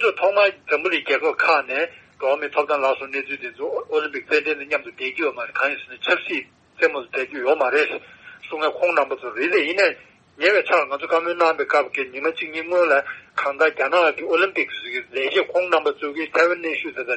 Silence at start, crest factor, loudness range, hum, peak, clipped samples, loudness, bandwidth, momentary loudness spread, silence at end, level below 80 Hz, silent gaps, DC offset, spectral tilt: 0 s; 18 dB; 3 LU; none; -4 dBFS; under 0.1%; -21 LUFS; 8.4 kHz; 9 LU; 0 s; -70 dBFS; none; under 0.1%; -3 dB/octave